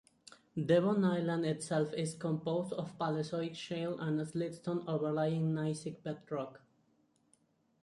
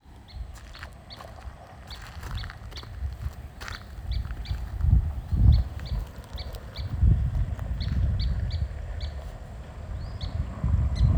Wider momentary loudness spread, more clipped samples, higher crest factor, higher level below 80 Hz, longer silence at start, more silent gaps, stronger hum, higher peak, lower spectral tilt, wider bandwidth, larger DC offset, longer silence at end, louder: second, 10 LU vs 18 LU; neither; about the same, 20 dB vs 20 dB; second, -76 dBFS vs -30 dBFS; first, 0.55 s vs 0.05 s; neither; neither; second, -16 dBFS vs -8 dBFS; about the same, -6.5 dB/octave vs -7 dB/octave; second, 11.5 kHz vs 14.5 kHz; neither; first, 1.25 s vs 0 s; second, -36 LUFS vs -30 LUFS